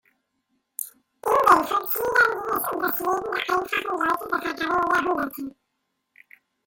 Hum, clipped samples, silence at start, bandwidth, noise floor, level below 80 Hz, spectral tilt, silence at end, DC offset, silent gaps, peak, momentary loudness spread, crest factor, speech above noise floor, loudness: none; under 0.1%; 0.8 s; 17 kHz; -77 dBFS; -60 dBFS; -3 dB/octave; 1.15 s; under 0.1%; none; -4 dBFS; 16 LU; 22 dB; 52 dB; -23 LUFS